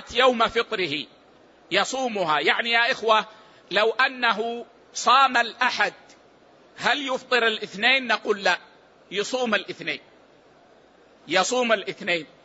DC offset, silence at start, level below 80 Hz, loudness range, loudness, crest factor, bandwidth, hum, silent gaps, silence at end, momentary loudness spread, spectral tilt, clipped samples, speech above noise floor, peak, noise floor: under 0.1%; 0 s; -64 dBFS; 5 LU; -22 LUFS; 20 dB; 8 kHz; none; none; 0.2 s; 11 LU; -2 dB/octave; under 0.1%; 32 dB; -6 dBFS; -55 dBFS